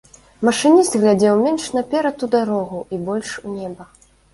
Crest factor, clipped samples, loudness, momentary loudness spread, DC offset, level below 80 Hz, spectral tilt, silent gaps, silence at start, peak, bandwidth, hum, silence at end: 16 dB; under 0.1%; -18 LUFS; 15 LU; under 0.1%; -56 dBFS; -5 dB/octave; none; 0.4 s; -2 dBFS; 11.5 kHz; 50 Hz at -55 dBFS; 0.5 s